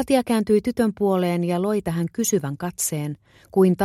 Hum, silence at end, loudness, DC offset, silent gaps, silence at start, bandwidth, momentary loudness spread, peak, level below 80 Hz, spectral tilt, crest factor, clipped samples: none; 0 s; -22 LUFS; under 0.1%; none; 0 s; 15.5 kHz; 8 LU; -6 dBFS; -54 dBFS; -5.5 dB/octave; 14 dB; under 0.1%